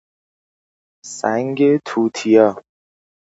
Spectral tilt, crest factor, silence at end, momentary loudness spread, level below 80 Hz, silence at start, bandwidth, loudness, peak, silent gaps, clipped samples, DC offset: -5.5 dB/octave; 18 dB; 0.65 s; 13 LU; -66 dBFS; 1.05 s; 8 kHz; -17 LUFS; 0 dBFS; none; under 0.1%; under 0.1%